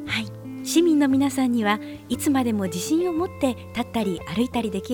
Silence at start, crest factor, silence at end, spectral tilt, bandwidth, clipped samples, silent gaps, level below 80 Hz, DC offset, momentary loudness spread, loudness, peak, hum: 0 s; 16 dB; 0 s; -4.5 dB/octave; 18.5 kHz; under 0.1%; none; -54 dBFS; under 0.1%; 9 LU; -23 LUFS; -6 dBFS; none